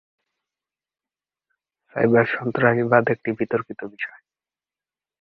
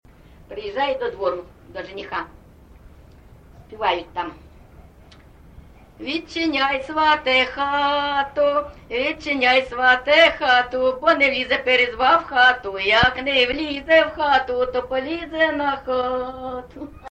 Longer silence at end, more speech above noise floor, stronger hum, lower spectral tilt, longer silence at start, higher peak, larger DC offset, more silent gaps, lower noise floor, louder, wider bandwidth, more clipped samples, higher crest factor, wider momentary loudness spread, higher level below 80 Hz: first, 1.15 s vs 0 s; first, over 69 dB vs 27 dB; neither; first, -10 dB/octave vs -4 dB/octave; first, 1.95 s vs 0.5 s; about the same, -2 dBFS vs -4 dBFS; neither; neither; first, under -90 dBFS vs -47 dBFS; about the same, -21 LUFS vs -19 LUFS; second, 4.9 kHz vs 8.8 kHz; neither; about the same, 22 dB vs 18 dB; about the same, 14 LU vs 16 LU; second, -62 dBFS vs -46 dBFS